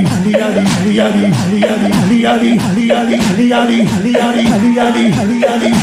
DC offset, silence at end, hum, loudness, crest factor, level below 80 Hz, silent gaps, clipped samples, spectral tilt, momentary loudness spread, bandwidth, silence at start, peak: under 0.1%; 0 s; none; -11 LUFS; 10 dB; -44 dBFS; none; under 0.1%; -6 dB/octave; 2 LU; 15.5 kHz; 0 s; 0 dBFS